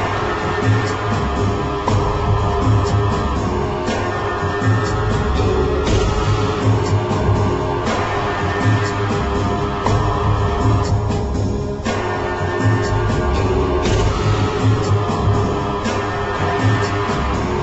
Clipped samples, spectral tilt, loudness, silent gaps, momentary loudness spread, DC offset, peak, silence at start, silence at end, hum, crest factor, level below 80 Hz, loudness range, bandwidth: under 0.1%; -6.5 dB/octave; -18 LUFS; none; 3 LU; under 0.1%; -6 dBFS; 0 s; 0 s; none; 12 dB; -26 dBFS; 1 LU; 8.2 kHz